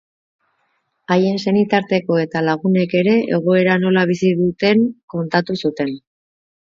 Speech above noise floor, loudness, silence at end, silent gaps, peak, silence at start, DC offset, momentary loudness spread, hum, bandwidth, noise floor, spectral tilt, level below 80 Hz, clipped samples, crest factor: 51 dB; -17 LUFS; 0.75 s; 5.03-5.08 s; -2 dBFS; 1.1 s; under 0.1%; 6 LU; none; 7.4 kHz; -67 dBFS; -7.5 dB/octave; -60 dBFS; under 0.1%; 16 dB